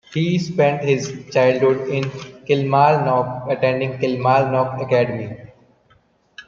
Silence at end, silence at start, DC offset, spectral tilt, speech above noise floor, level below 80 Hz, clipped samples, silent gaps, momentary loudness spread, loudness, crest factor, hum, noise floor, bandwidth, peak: 0.05 s; 0.1 s; under 0.1%; -6.5 dB/octave; 40 dB; -58 dBFS; under 0.1%; none; 9 LU; -19 LUFS; 18 dB; none; -58 dBFS; 7.4 kHz; -2 dBFS